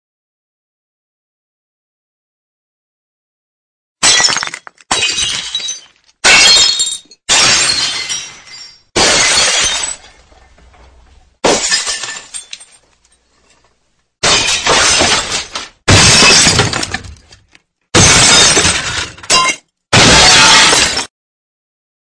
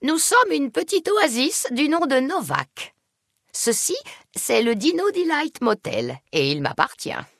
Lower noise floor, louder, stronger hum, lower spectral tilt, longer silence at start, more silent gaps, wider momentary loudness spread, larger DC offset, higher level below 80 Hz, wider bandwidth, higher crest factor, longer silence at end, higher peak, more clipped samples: second, -60 dBFS vs -74 dBFS; first, -8 LUFS vs -21 LUFS; neither; second, -1 dB/octave vs -3 dB/octave; first, 4 s vs 0 s; neither; first, 18 LU vs 11 LU; neither; first, -34 dBFS vs -66 dBFS; about the same, 11 kHz vs 12 kHz; second, 12 dB vs 20 dB; first, 1.1 s vs 0.15 s; about the same, 0 dBFS vs -2 dBFS; first, 0.3% vs under 0.1%